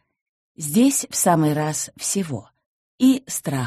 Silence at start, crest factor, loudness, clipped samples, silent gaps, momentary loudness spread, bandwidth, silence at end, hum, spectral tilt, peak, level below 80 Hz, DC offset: 0.6 s; 16 dB; -20 LUFS; under 0.1%; 2.66-2.98 s; 10 LU; 13 kHz; 0 s; none; -4.5 dB/octave; -6 dBFS; -62 dBFS; under 0.1%